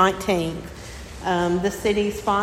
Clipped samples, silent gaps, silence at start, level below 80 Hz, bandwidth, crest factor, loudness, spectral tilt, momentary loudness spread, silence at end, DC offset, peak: under 0.1%; none; 0 s; -42 dBFS; 16.5 kHz; 18 dB; -23 LUFS; -5 dB/octave; 15 LU; 0 s; under 0.1%; -4 dBFS